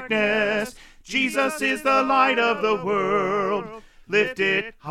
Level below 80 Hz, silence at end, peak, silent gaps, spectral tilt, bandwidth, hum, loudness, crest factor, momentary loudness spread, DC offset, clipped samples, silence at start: -54 dBFS; 0 s; -6 dBFS; none; -4 dB/octave; 15.5 kHz; none; -22 LUFS; 16 dB; 8 LU; under 0.1%; under 0.1%; 0 s